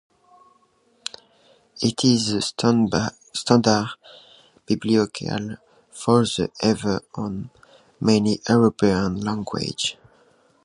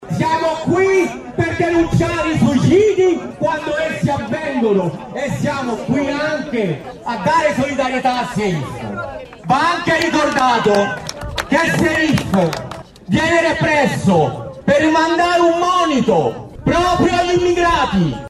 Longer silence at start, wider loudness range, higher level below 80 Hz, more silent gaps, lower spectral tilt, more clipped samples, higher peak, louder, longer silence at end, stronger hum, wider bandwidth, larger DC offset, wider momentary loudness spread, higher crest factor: first, 1.75 s vs 0 s; about the same, 2 LU vs 4 LU; second, -52 dBFS vs -40 dBFS; neither; about the same, -5 dB/octave vs -5.5 dB/octave; neither; first, 0 dBFS vs -4 dBFS; second, -22 LUFS vs -16 LUFS; first, 0.7 s vs 0 s; neither; second, 11.5 kHz vs 14 kHz; neither; first, 16 LU vs 9 LU; first, 22 dB vs 12 dB